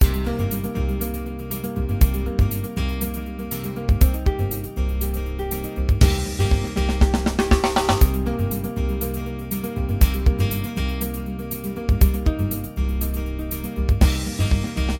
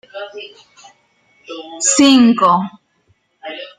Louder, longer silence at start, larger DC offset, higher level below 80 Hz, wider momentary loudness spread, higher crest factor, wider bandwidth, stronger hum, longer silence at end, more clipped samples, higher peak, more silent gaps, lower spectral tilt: second, -23 LUFS vs -11 LUFS; second, 0 s vs 0.15 s; neither; first, -22 dBFS vs -62 dBFS; second, 9 LU vs 24 LU; about the same, 18 dB vs 16 dB; first, 18 kHz vs 11 kHz; neither; about the same, 0 s vs 0.1 s; neither; about the same, -2 dBFS vs 0 dBFS; neither; first, -6 dB/octave vs -3 dB/octave